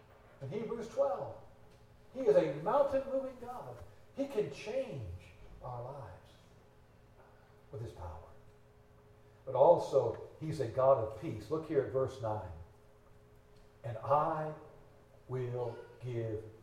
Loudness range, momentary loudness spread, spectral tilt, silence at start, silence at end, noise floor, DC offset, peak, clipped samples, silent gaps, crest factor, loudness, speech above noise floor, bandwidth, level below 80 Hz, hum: 17 LU; 21 LU; -7.5 dB/octave; 0.4 s; 0.05 s; -61 dBFS; under 0.1%; -14 dBFS; under 0.1%; none; 24 dB; -35 LUFS; 27 dB; 11.5 kHz; -62 dBFS; none